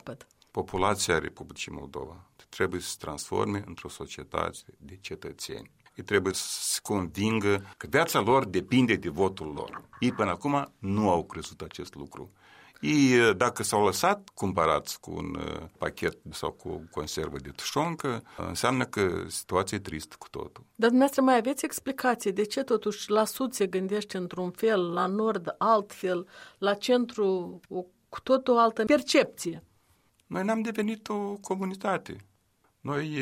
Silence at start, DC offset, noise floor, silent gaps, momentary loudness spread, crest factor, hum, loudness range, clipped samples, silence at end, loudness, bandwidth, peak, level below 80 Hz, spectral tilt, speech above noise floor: 0.05 s; under 0.1%; -69 dBFS; none; 17 LU; 20 dB; none; 7 LU; under 0.1%; 0 s; -28 LUFS; 16 kHz; -8 dBFS; -58 dBFS; -4.5 dB/octave; 41 dB